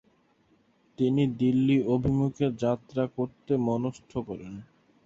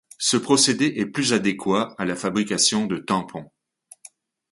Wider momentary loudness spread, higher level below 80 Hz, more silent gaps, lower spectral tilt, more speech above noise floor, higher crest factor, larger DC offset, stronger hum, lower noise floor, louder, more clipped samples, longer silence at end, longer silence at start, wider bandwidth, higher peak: first, 13 LU vs 8 LU; first, -54 dBFS vs -62 dBFS; neither; first, -8.5 dB/octave vs -3 dB/octave; first, 39 dB vs 29 dB; about the same, 16 dB vs 18 dB; neither; neither; first, -66 dBFS vs -51 dBFS; second, -27 LUFS vs -21 LUFS; neither; second, 0.4 s vs 1.05 s; first, 1 s vs 0.2 s; second, 7.6 kHz vs 11.5 kHz; second, -12 dBFS vs -6 dBFS